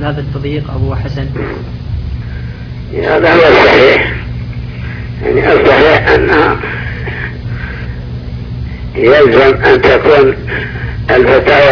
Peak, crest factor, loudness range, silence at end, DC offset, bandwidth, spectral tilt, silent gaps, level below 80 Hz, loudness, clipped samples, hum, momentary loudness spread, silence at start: 0 dBFS; 10 dB; 5 LU; 0 s; under 0.1%; 5.4 kHz; -7.5 dB/octave; none; -24 dBFS; -9 LUFS; 2%; none; 17 LU; 0 s